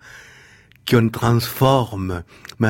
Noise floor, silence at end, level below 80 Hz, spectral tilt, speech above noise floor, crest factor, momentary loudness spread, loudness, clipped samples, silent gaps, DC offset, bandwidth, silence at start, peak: -49 dBFS; 0 s; -46 dBFS; -6.5 dB/octave; 31 dB; 18 dB; 14 LU; -19 LUFS; under 0.1%; none; under 0.1%; 17 kHz; 0.05 s; -2 dBFS